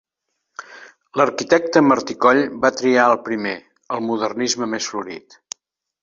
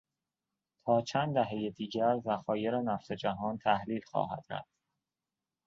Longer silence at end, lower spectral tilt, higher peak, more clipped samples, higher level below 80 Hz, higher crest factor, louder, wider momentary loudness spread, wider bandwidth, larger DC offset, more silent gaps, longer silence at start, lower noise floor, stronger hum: second, 0.85 s vs 1.05 s; second, -4 dB/octave vs -6.5 dB/octave; first, 0 dBFS vs -14 dBFS; neither; first, -64 dBFS vs -70 dBFS; about the same, 20 dB vs 20 dB; first, -18 LUFS vs -33 LUFS; first, 20 LU vs 7 LU; about the same, 7.8 kHz vs 7.8 kHz; neither; neither; second, 0.6 s vs 0.85 s; second, -77 dBFS vs under -90 dBFS; neither